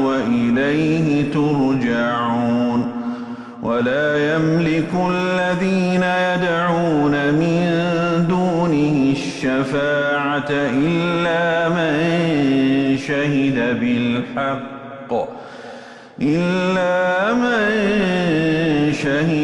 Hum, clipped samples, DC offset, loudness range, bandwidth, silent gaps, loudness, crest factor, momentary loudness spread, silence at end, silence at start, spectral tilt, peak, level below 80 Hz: none; under 0.1%; under 0.1%; 3 LU; 11.5 kHz; none; -18 LUFS; 10 dB; 7 LU; 0 s; 0 s; -6.5 dB/octave; -8 dBFS; -50 dBFS